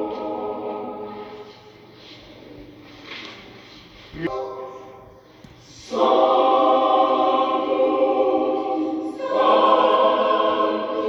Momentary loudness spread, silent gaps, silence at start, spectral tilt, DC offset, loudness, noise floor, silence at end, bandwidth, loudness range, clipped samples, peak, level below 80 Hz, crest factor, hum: 20 LU; none; 0 s; -5.5 dB/octave; under 0.1%; -20 LUFS; -46 dBFS; 0 s; 7.6 kHz; 17 LU; under 0.1%; -4 dBFS; -60 dBFS; 18 dB; none